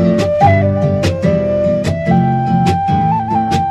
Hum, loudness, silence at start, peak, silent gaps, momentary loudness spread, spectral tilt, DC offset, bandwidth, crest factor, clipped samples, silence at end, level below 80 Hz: none; -13 LUFS; 0 s; 0 dBFS; none; 4 LU; -7.5 dB/octave; under 0.1%; 12 kHz; 12 dB; under 0.1%; 0 s; -36 dBFS